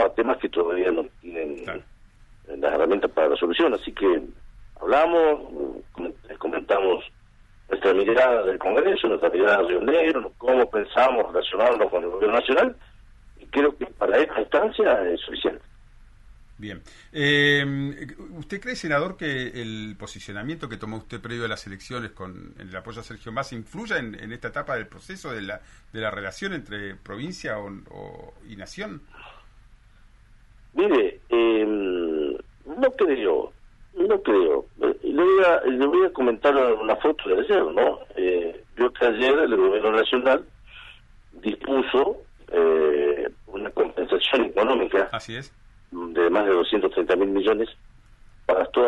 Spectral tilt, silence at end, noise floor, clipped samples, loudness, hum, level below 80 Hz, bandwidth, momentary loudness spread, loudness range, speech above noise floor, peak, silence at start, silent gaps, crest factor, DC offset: -5.5 dB/octave; 0 s; -52 dBFS; under 0.1%; -23 LUFS; none; -50 dBFS; 11 kHz; 17 LU; 12 LU; 30 dB; -6 dBFS; 0 s; none; 16 dB; under 0.1%